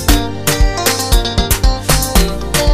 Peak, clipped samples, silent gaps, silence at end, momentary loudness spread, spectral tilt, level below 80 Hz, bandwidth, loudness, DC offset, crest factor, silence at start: 0 dBFS; under 0.1%; none; 0 s; 3 LU; -3.5 dB/octave; -16 dBFS; 16 kHz; -14 LUFS; under 0.1%; 12 dB; 0 s